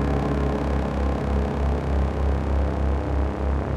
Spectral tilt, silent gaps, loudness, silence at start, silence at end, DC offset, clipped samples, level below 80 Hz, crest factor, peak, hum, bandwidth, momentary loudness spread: -8.5 dB/octave; none; -25 LUFS; 0 s; 0 s; under 0.1%; under 0.1%; -24 dBFS; 12 dB; -12 dBFS; none; 7.4 kHz; 1 LU